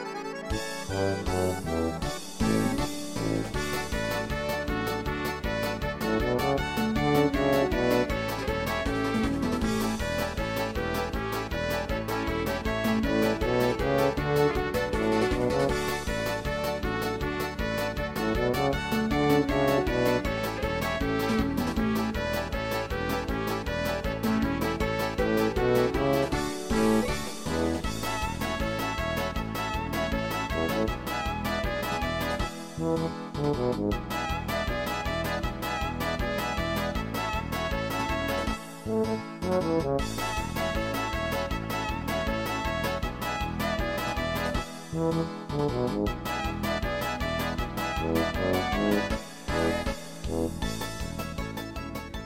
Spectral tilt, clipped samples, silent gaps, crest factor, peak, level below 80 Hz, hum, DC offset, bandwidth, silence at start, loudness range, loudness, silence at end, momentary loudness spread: -5.5 dB/octave; under 0.1%; none; 18 dB; -10 dBFS; -40 dBFS; none; under 0.1%; 17 kHz; 0 s; 3 LU; -29 LUFS; 0 s; 6 LU